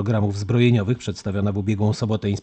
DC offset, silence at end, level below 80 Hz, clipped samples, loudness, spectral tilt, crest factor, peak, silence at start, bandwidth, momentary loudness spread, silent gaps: under 0.1%; 0 s; -52 dBFS; under 0.1%; -22 LUFS; -7.5 dB/octave; 16 dB; -4 dBFS; 0 s; 8.6 kHz; 7 LU; none